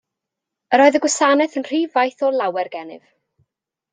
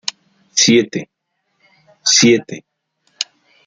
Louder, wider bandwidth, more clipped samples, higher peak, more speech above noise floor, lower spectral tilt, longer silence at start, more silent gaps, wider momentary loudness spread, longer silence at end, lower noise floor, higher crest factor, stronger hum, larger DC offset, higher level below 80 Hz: second, -17 LUFS vs -14 LUFS; about the same, 9.6 kHz vs 10.5 kHz; neither; about the same, -2 dBFS vs 0 dBFS; first, 65 dB vs 55 dB; about the same, -2 dB/octave vs -2.5 dB/octave; first, 0.7 s vs 0.55 s; neither; second, 13 LU vs 17 LU; first, 0.95 s vs 0.45 s; first, -83 dBFS vs -68 dBFS; about the same, 18 dB vs 18 dB; neither; neither; second, -70 dBFS vs -60 dBFS